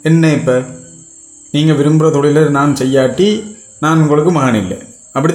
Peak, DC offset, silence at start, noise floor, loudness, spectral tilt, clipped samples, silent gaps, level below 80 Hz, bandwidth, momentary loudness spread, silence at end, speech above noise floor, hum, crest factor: 0 dBFS; under 0.1%; 0.05 s; -38 dBFS; -12 LUFS; -6.5 dB/octave; under 0.1%; none; -50 dBFS; 12.5 kHz; 12 LU; 0 s; 27 dB; none; 12 dB